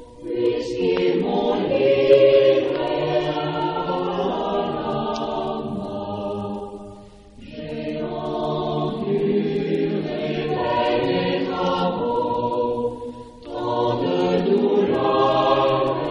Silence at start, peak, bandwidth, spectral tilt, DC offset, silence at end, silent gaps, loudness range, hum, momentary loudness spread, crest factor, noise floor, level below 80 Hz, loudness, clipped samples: 0 s; -4 dBFS; 8.2 kHz; -7 dB/octave; under 0.1%; 0 s; none; 9 LU; none; 11 LU; 18 dB; -43 dBFS; -50 dBFS; -21 LUFS; under 0.1%